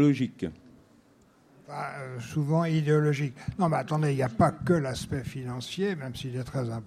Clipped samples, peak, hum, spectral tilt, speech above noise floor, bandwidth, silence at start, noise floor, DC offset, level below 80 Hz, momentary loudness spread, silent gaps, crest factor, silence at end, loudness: under 0.1%; -10 dBFS; none; -7 dB/octave; 33 dB; 13.5 kHz; 0 s; -60 dBFS; under 0.1%; -56 dBFS; 12 LU; none; 20 dB; 0 s; -29 LUFS